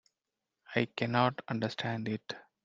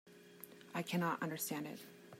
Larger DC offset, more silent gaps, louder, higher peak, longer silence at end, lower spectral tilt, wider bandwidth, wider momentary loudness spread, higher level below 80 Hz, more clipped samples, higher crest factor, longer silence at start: neither; neither; first, -33 LUFS vs -41 LUFS; first, -12 dBFS vs -24 dBFS; first, 0.25 s vs 0 s; first, -6.5 dB/octave vs -4.5 dB/octave; second, 7.6 kHz vs 16 kHz; second, 9 LU vs 18 LU; first, -74 dBFS vs -88 dBFS; neither; first, 24 dB vs 18 dB; first, 0.7 s vs 0.05 s